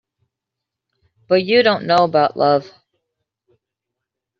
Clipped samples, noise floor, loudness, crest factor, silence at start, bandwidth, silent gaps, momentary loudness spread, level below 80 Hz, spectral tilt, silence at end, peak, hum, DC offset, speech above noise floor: under 0.1%; -83 dBFS; -16 LUFS; 18 dB; 1.3 s; 7.4 kHz; none; 5 LU; -66 dBFS; -3 dB/octave; 1.7 s; -2 dBFS; none; under 0.1%; 68 dB